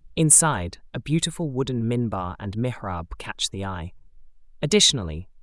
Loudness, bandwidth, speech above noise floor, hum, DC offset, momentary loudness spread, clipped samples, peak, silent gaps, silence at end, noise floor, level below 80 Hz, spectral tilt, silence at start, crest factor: -22 LUFS; 12 kHz; 21 dB; none; under 0.1%; 19 LU; under 0.1%; -4 dBFS; none; 0.15 s; -45 dBFS; -46 dBFS; -3 dB/octave; 0.05 s; 20 dB